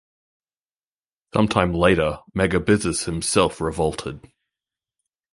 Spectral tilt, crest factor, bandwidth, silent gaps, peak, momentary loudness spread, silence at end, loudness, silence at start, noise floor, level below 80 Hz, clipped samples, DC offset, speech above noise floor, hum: -5 dB/octave; 22 dB; 11.5 kHz; none; -2 dBFS; 7 LU; 1.15 s; -21 LUFS; 1.35 s; under -90 dBFS; -42 dBFS; under 0.1%; under 0.1%; over 69 dB; none